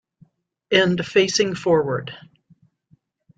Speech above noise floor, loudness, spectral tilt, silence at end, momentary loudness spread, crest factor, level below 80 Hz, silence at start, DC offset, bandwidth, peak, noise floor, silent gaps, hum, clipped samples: 41 dB; -19 LUFS; -4 dB/octave; 1.2 s; 9 LU; 20 dB; -60 dBFS; 0.7 s; under 0.1%; 9.2 kHz; -2 dBFS; -61 dBFS; none; none; under 0.1%